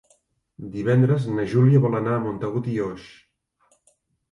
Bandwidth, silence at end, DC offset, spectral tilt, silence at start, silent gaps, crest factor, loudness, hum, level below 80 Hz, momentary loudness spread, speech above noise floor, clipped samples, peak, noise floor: 7.2 kHz; 1.25 s; under 0.1%; -9.5 dB/octave; 0.6 s; none; 16 dB; -22 LUFS; none; -58 dBFS; 15 LU; 44 dB; under 0.1%; -6 dBFS; -65 dBFS